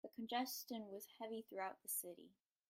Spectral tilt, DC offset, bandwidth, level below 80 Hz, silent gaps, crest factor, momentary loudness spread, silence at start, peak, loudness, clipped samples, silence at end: -2 dB/octave; under 0.1%; 16 kHz; under -90 dBFS; none; 18 dB; 10 LU; 0.05 s; -32 dBFS; -47 LUFS; under 0.1%; 0.35 s